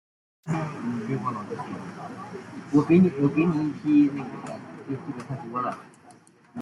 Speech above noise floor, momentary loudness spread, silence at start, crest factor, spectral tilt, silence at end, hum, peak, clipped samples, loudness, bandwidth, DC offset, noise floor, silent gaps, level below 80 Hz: 28 dB; 19 LU; 0.45 s; 18 dB; -8.5 dB/octave; 0 s; none; -8 dBFS; under 0.1%; -25 LUFS; 11 kHz; under 0.1%; -53 dBFS; none; -64 dBFS